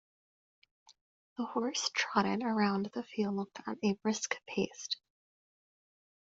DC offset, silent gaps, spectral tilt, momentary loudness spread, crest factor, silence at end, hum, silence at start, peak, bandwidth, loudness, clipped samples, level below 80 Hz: under 0.1%; 1.01-1.36 s; -4 dB/octave; 8 LU; 22 dB; 1.35 s; none; 0.9 s; -14 dBFS; 7.8 kHz; -34 LUFS; under 0.1%; -76 dBFS